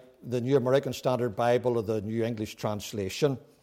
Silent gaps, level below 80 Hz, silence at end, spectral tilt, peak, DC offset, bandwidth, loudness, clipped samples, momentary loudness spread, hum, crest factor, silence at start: none; -64 dBFS; 0.2 s; -6 dB/octave; -14 dBFS; under 0.1%; 16.5 kHz; -29 LUFS; under 0.1%; 8 LU; none; 16 dB; 0.25 s